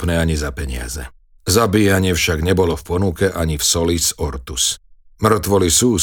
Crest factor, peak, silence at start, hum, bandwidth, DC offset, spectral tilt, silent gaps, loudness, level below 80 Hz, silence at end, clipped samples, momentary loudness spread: 16 dB; -2 dBFS; 0 s; none; over 20 kHz; 0.1%; -4 dB/octave; none; -17 LUFS; -30 dBFS; 0 s; under 0.1%; 12 LU